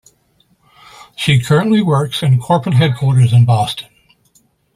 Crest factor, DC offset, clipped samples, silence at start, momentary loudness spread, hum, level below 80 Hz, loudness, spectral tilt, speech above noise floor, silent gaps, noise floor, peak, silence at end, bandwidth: 14 dB; under 0.1%; under 0.1%; 1.2 s; 9 LU; none; -50 dBFS; -13 LUFS; -6.5 dB/octave; 45 dB; none; -57 dBFS; 0 dBFS; 0.95 s; 14 kHz